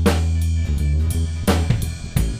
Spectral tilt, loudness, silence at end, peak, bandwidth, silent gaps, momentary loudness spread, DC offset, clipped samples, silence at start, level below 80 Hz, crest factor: -6 dB/octave; -21 LUFS; 0 s; -4 dBFS; 16 kHz; none; 4 LU; under 0.1%; under 0.1%; 0 s; -22 dBFS; 14 dB